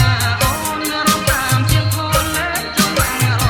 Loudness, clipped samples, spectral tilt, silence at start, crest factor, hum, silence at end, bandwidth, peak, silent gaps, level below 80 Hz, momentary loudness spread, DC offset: -16 LUFS; under 0.1%; -3.5 dB/octave; 0 s; 14 dB; none; 0 s; 19 kHz; -2 dBFS; none; -28 dBFS; 4 LU; under 0.1%